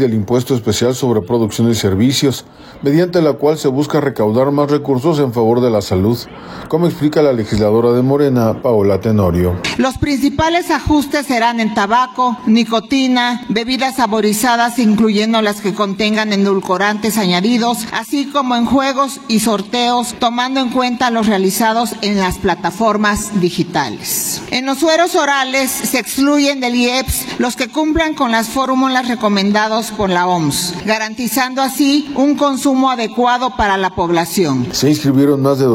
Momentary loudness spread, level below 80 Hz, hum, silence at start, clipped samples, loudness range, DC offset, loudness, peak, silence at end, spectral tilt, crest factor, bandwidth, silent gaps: 4 LU; -38 dBFS; none; 0 s; under 0.1%; 1 LU; under 0.1%; -14 LUFS; -2 dBFS; 0 s; -4.5 dB/octave; 12 dB; 16.5 kHz; none